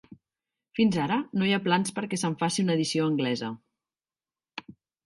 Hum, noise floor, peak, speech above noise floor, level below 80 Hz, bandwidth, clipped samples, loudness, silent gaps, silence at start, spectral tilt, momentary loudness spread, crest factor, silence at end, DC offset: none; under -90 dBFS; -8 dBFS; over 64 dB; -68 dBFS; 11.5 kHz; under 0.1%; -27 LUFS; none; 0.1 s; -5 dB/octave; 18 LU; 20 dB; 0.35 s; under 0.1%